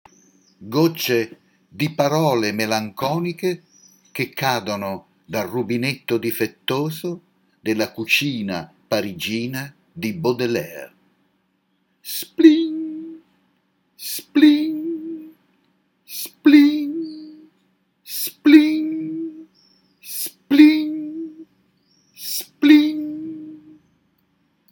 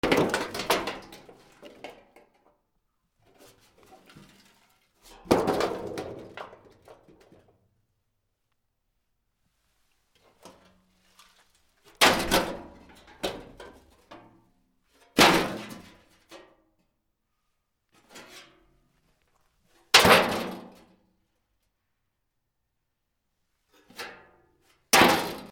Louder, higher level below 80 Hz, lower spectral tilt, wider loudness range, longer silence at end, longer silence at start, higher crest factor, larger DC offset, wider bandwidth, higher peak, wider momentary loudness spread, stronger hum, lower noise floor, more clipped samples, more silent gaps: first, -20 LUFS vs -23 LUFS; second, -68 dBFS vs -56 dBFS; first, -5 dB/octave vs -2.5 dB/octave; second, 7 LU vs 18 LU; first, 1.15 s vs 0.05 s; first, 0.6 s vs 0.05 s; second, 20 dB vs 30 dB; neither; about the same, 18.5 kHz vs over 20 kHz; about the same, 0 dBFS vs 0 dBFS; second, 20 LU vs 28 LU; neither; second, -67 dBFS vs -80 dBFS; neither; neither